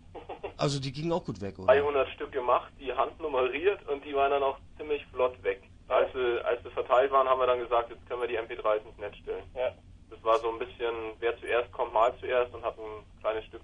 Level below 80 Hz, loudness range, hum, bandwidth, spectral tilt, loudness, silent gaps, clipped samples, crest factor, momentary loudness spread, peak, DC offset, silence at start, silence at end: -56 dBFS; 4 LU; none; 10.5 kHz; -5.5 dB/octave; -30 LUFS; none; under 0.1%; 20 dB; 13 LU; -10 dBFS; under 0.1%; 0.1 s; 0.05 s